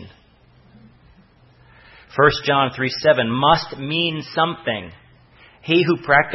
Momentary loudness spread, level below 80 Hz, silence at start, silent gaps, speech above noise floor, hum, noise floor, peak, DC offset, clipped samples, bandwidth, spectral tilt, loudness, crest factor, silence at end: 11 LU; -50 dBFS; 0 s; none; 34 dB; none; -53 dBFS; -2 dBFS; under 0.1%; under 0.1%; 6 kHz; -6 dB/octave; -19 LUFS; 20 dB; 0 s